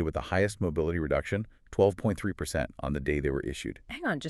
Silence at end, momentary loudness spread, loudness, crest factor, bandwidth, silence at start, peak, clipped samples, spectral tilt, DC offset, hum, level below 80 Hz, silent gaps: 0 s; 8 LU; -30 LUFS; 20 dB; 13.5 kHz; 0 s; -10 dBFS; under 0.1%; -6 dB/octave; under 0.1%; none; -44 dBFS; none